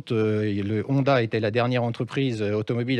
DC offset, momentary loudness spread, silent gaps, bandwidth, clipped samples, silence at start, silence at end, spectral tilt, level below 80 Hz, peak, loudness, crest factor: under 0.1%; 5 LU; none; 9.8 kHz; under 0.1%; 0.05 s; 0 s; -8 dB/octave; -66 dBFS; -8 dBFS; -24 LUFS; 16 dB